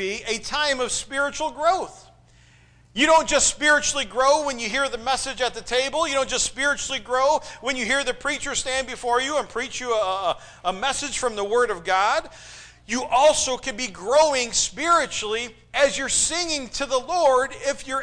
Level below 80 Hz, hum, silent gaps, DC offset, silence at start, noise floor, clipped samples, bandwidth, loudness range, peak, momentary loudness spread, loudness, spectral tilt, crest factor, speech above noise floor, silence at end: -48 dBFS; none; none; under 0.1%; 0 s; -54 dBFS; under 0.1%; 10.5 kHz; 4 LU; -8 dBFS; 10 LU; -22 LUFS; -1 dB/octave; 16 dB; 31 dB; 0 s